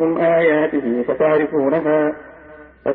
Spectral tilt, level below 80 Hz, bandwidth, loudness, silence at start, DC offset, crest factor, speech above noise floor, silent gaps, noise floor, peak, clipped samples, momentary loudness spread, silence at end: -12 dB/octave; -54 dBFS; 4.1 kHz; -17 LUFS; 0 s; under 0.1%; 12 dB; 25 dB; none; -42 dBFS; -4 dBFS; under 0.1%; 7 LU; 0 s